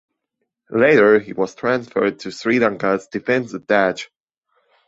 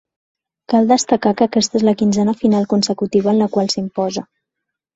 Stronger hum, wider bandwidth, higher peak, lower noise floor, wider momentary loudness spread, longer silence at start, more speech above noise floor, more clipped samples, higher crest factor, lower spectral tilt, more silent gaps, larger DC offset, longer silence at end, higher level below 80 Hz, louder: neither; about the same, 8 kHz vs 8 kHz; about the same, -2 dBFS vs -2 dBFS; second, -76 dBFS vs -80 dBFS; first, 12 LU vs 6 LU; about the same, 0.7 s vs 0.7 s; second, 59 dB vs 65 dB; neither; about the same, 18 dB vs 14 dB; about the same, -6 dB/octave vs -5 dB/octave; neither; neither; about the same, 0.8 s vs 0.75 s; second, -62 dBFS vs -56 dBFS; about the same, -18 LUFS vs -16 LUFS